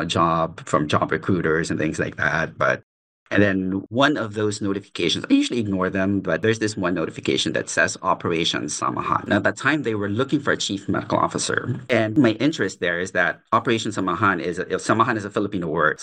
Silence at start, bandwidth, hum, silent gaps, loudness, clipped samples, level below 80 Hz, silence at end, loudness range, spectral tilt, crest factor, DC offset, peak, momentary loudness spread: 0 s; 10 kHz; none; 2.83-3.26 s; -22 LUFS; under 0.1%; -58 dBFS; 0 s; 1 LU; -4.5 dB/octave; 18 dB; under 0.1%; -4 dBFS; 5 LU